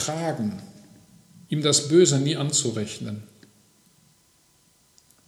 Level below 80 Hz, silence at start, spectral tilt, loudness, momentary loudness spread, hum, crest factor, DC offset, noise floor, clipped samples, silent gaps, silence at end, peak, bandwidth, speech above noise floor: -68 dBFS; 0 s; -4 dB/octave; -22 LUFS; 17 LU; none; 20 dB; under 0.1%; -61 dBFS; under 0.1%; none; 2 s; -6 dBFS; 13.5 kHz; 38 dB